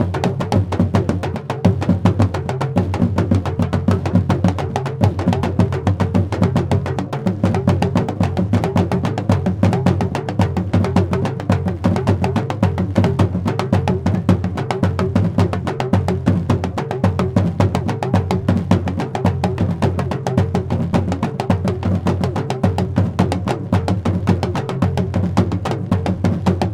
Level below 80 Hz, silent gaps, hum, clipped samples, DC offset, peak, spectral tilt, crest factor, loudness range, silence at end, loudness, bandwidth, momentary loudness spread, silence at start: -38 dBFS; none; none; under 0.1%; under 0.1%; 0 dBFS; -8 dB/octave; 16 dB; 1 LU; 0 s; -18 LUFS; 11 kHz; 3 LU; 0 s